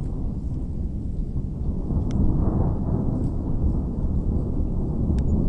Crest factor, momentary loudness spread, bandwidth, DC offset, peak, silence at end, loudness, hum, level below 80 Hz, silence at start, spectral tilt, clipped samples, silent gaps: 14 dB; 7 LU; 5.4 kHz; under 0.1%; -8 dBFS; 0 s; -26 LUFS; none; -26 dBFS; 0 s; -11 dB/octave; under 0.1%; none